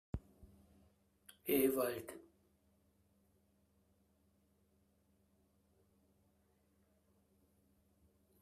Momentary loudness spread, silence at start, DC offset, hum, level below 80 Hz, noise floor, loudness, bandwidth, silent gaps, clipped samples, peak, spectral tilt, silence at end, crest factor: 19 LU; 0.15 s; under 0.1%; none; -68 dBFS; -76 dBFS; -38 LUFS; 15.5 kHz; none; under 0.1%; -22 dBFS; -5 dB/octave; 6.2 s; 24 dB